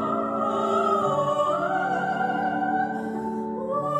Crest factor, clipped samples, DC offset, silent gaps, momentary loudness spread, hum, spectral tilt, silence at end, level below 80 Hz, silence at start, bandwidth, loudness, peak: 14 dB; under 0.1%; under 0.1%; none; 7 LU; none; -6.5 dB/octave; 0 s; -62 dBFS; 0 s; 12.5 kHz; -25 LUFS; -12 dBFS